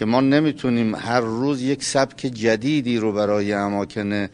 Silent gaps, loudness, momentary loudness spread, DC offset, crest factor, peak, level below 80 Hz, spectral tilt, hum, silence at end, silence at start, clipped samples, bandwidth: none; -21 LUFS; 6 LU; under 0.1%; 18 dB; -2 dBFS; -56 dBFS; -5.5 dB/octave; none; 0.05 s; 0 s; under 0.1%; 10.5 kHz